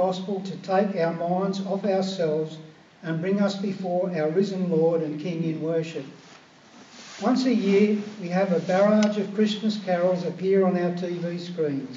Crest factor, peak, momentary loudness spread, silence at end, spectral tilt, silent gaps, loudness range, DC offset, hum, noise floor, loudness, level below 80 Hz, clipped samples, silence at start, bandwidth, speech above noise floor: 16 dB; -8 dBFS; 10 LU; 0 s; -6 dB/octave; none; 4 LU; under 0.1%; none; -50 dBFS; -25 LUFS; -80 dBFS; under 0.1%; 0 s; 7.6 kHz; 26 dB